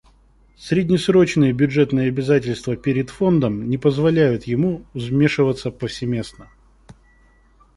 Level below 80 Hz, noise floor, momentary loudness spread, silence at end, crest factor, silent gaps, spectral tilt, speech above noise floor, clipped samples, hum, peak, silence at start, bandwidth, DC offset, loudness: -48 dBFS; -54 dBFS; 9 LU; 0.85 s; 18 dB; none; -7 dB/octave; 35 dB; under 0.1%; none; -2 dBFS; 0.6 s; 11.5 kHz; under 0.1%; -19 LUFS